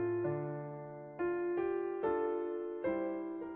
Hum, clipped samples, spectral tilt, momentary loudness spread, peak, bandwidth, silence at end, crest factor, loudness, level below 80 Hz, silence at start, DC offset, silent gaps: none; under 0.1%; -8 dB/octave; 8 LU; -24 dBFS; 3.8 kHz; 0 s; 14 dB; -37 LUFS; -70 dBFS; 0 s; under 0.1%; none